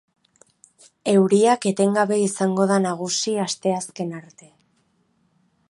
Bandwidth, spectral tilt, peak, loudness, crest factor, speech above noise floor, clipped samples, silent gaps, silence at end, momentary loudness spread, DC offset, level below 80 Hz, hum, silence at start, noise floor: 11.5 kHz; -5 dB/octave; -4 dBFS; -21 LUFS; 18 dB; 45 dB; under 0.1%; none; 1.5 s; 13 LU; under 0.1%; -72 dBFS; none; 1.05 s; -65 dBFS